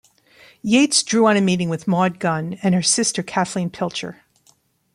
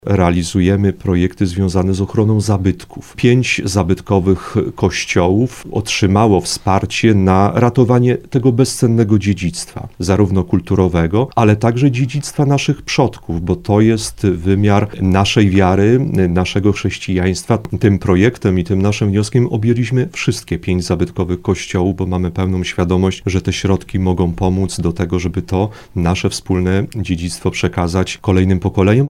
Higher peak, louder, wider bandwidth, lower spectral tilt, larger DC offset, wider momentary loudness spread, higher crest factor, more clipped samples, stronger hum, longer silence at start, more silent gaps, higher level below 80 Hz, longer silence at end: second, -4 dBFS vs 0 dBFS; second, -19 LUFS vs -15 LUFS; about the same, 12 kHz vs 13 kHz; second, -4 dB/octave vs -6.5 dB/octave; neither; first, 10 LU vs 7 LU; about the same, 16 dB vs 14 dB; neither; neither; first, 0.65 s vs 0.05 s; neither; second, -62 dBFS vs -36 dBFS; first, 0.8 s vs 0 s